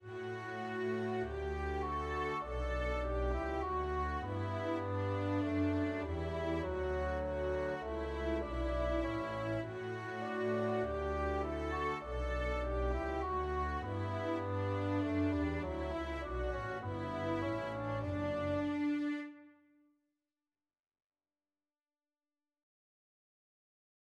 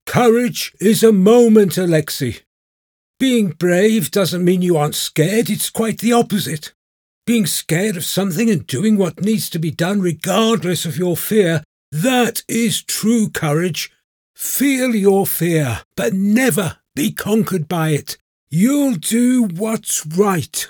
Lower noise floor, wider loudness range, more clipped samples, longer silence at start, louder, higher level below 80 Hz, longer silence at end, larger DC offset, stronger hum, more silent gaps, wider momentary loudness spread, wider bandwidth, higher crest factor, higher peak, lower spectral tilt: about the same, under -90 dBFS vs under -90 dBFS; about the same, 2 LU vs 3 LU; neither; about the same, 0 s vs 0.05 s; second, -38 LUFS vs -16 LUFS; first, -46 dBFS vs -58 dBFS; first, 4.6 s vs 0 s; neither; neither; second, none vs 2.46-3.14 s, 6.75-7.22 s, 11.65-11.92 s, 14.04-14.34 s, 15.85-15.91 s, 18.21-18.47 s; second, 5 LU vs 8 LU; second, 9.8 kHz vs over 20 kHz; about the same, 14 dB vs 16 dB; second, -24 dBFS vs 0 dBFS; first, -7.5 dB/octave vs -5 dB/octave